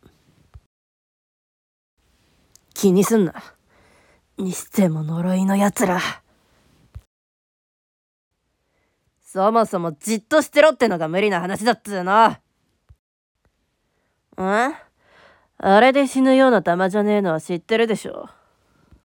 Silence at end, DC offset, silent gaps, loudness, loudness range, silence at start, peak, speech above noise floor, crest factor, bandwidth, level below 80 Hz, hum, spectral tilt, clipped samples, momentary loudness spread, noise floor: 0.85 s; under 0.1%; 7.07-8.31 s, 12.99-13.35 s; -19 LUFS; 8 LU; 2.75 s; -2 dBFS; 52 dB; 20 dB; 18 kHz; -58 dBFS; none; -5.5 dB/octave; under 0.1%; 13 LU; -70 dBFS